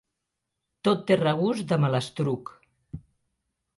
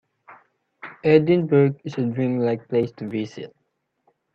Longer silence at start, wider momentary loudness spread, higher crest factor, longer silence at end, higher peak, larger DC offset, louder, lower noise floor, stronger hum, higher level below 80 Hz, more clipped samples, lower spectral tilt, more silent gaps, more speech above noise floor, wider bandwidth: first, 0.85 s vs 0.3 s; about the same, 22 LU vs 22 LU; about the same, 20 dB vs 20 dB; about the same, 0.8 s vs 0.85 s; second, -8 dBFS vs -2 dBFS; neither; second, -26 LUFS vs -21 LUFS; first, -83 dBFS vs -73 dBFS; neither; first, -60 dBFS vs -66 dBFS; neither; second, -7 dB/octave vs -9 dB/octave; neither; first, 58 dB vs 53 dB; first, 11.5 kHz vs 6.8 kHz